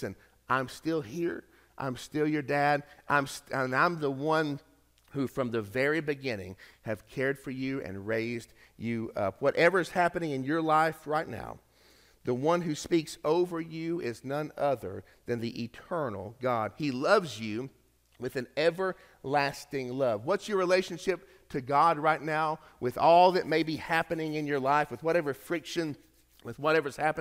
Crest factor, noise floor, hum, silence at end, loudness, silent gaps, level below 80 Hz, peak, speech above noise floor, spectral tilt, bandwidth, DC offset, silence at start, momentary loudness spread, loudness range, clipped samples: 20 dB; -61 dBFS; none; 0 s; -30 LUFS; none; -64 dBFS; -10 dBFS; 32 dB; -5.5 dB/octave; 16 kHz; under 0.1%; 0 s; 13 LU; 6 LU; under 0.1%